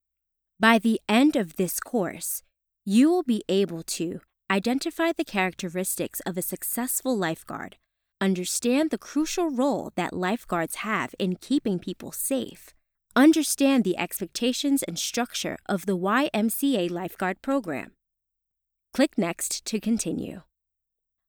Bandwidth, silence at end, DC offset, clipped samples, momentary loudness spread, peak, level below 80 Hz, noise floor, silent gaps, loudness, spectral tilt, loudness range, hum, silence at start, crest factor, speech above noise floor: over 20 kHz; 0.9 s; under 0.1%; under 0.1%; 10 LU; -6 dBFS; -62 dBFS; -83 dBFS; none; -26 LUFS; -4 dB/octave; 5 LU; none; 0.6 s; 20 dB; 58 dB